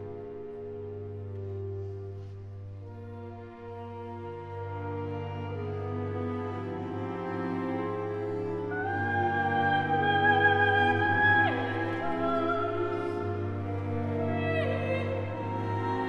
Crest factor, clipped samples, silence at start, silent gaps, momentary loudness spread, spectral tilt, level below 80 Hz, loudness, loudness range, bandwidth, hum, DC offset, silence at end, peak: 18 dB; under 0.1%; 0 s; none; 18 LU; -8 dB/octave; -62 dBFS; -30 LUFS; 15 LU; 6.4 kHz; none; under 0.1%; 0 s; -12 dBFS